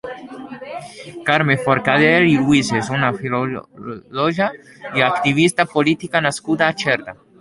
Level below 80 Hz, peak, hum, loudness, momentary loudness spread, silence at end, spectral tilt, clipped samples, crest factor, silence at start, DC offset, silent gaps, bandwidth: -54 dBFS; -2 dBFS; none; -17 LUFS; 19 LU; 0.3 s; -5 dB/octave; under 0.1%; 18 dB; 0.05 s; under 0.1%; none; 11.5 kHz